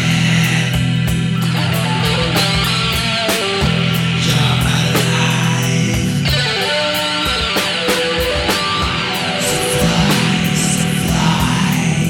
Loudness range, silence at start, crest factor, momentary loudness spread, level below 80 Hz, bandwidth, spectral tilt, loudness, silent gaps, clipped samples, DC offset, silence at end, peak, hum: 1 LU; 0 s; 14 dB; 3 LU; -32 dBFS; 18 kHz; -4 dB/octave; -15 LUFS; none; under 0.1%; under 0.1%; 0 s; -2 dBFS; none